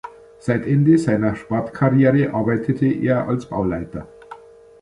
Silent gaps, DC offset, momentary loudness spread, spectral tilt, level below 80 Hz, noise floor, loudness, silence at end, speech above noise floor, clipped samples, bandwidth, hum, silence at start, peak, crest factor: none; under 0.1%; 14 LU; -9 dB/octave; -48 dBFS; -42 dBFS; -19 LUFS; 0.45 s; 24 dB; under 0.1%; 11 kHz; none; 0.05 s; -2 dBFS; 16 dB